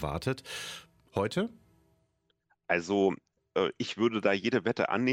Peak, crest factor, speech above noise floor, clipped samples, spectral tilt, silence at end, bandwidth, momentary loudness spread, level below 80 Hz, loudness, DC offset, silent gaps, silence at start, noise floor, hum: -12 dBFS; 20 dB; 45 dB; under 0.1%; -5.5 dB/octave; 0 s; 16 kHz; 11 LU; -58 dBFS; -31 LUFS; under 0.1%; none; 0 s; -75 dBFS; none